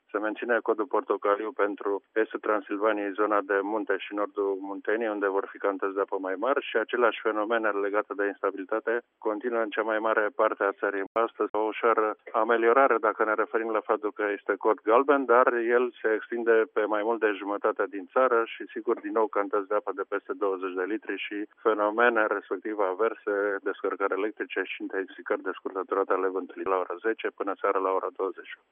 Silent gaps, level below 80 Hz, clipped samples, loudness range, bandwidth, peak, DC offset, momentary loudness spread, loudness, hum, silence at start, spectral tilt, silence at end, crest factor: 11.07-11.15 s, 11.49-11.54 s; -86 dBFS; under 0.1%; 5 LU; 3.7 kHz; -6 dBFS; under 0.1%; 9 LU; -27 LUFS; none; 0.15 s; -1 dB/octave; 0.15 s; 20 dB